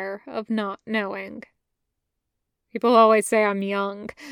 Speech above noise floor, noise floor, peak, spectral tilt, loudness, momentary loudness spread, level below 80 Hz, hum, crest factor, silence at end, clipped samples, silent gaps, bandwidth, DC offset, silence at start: 57 dB; -80 dBFS; -4 dBFS; -4.5 dB/octave; -22 LUFS; 21 LU; -70 dBFS; none; 20 dB; 0 s; under 0.1%; none; 17 kHz; under 0.1%; 0 s